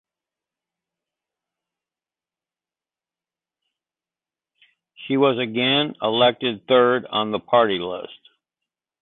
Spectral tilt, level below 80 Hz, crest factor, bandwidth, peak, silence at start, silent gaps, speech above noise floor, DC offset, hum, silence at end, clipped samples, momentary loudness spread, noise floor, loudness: -9.5 dB/octave; -66 dBFS; 20 dB; 4.2 kHz; -4 dBFS; 5 s; none; over 70 dB; under 0.1%; none; 0.85 s; under 0.1%; 12 LU; under -90 dBFS; -20 LUFS